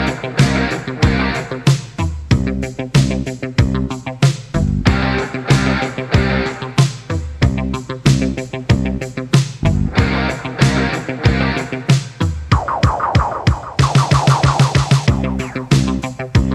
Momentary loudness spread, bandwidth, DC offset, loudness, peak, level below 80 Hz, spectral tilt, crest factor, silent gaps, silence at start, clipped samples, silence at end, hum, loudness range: 7 LU; 12.5 kHz; under 0.1%; -17 LUFS; 0 dBFS; -26 dBFS; -6 dB/octave; 16 dB; none; 0 s; under 0.1%; 0 s; none; 3 LU